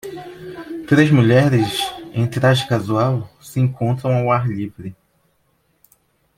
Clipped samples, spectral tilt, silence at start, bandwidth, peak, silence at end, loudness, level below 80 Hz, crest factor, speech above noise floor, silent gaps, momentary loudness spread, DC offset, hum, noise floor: under 0.1%; -6.5 dB/octave; 0.05 s; 15.5 kHz; -2 dBFS; 1.45 s; -17 LUFS; -54 dBFS; 18 dB; 46 dB; none; 20 LU; under 0.1%; none; -63 dBFS